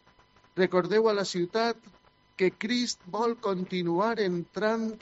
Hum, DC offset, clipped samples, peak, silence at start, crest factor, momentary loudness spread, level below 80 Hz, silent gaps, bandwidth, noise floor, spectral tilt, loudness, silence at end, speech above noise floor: none; under 0.1%; under 0.1%; -10 dBFS; 0.55 s; 20 dB; 7 LU; -70 dBFS; none; 8 kHz; -61 dBFS; -4 dB/octave; -28 LUFS; 0.05 s; 33 dB